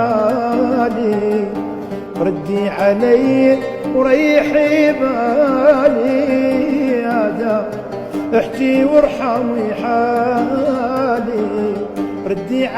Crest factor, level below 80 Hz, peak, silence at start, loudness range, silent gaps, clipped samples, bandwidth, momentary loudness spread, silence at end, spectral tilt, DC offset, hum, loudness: 14 dB; -48 dBFS; 0 dBFS; 0 s; 3 LU; none; under 0.1%; 14.5 kHz; 10 LU; 0 s; -7 dB/octave; under 0.1%; none; -15 LUFS